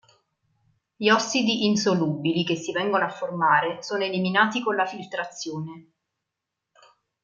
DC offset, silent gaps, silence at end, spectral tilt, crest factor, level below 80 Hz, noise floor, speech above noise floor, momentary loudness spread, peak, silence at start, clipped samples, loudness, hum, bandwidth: under 0.1%; none; 1.45 s; -4.5 dB/octave; 20 dB; -72 dBFS; -84 dBFS; 60 dB; 11 LU; -6 dBFS; 1 s; under 0.1%; -24 LUFS; none; 7.6 kHz